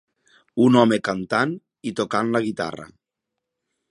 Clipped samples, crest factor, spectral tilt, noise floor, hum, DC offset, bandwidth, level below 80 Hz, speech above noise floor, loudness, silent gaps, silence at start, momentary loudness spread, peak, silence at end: under 0.1%; 22 dB; -6 dB/octave; -83 dBFS; none; under 0.1%; 11 kHz; -64 dBFS; 62 dB; -21 LUFS; none; 0.55 s; 15 LU; -2 dBFS; 1.05 s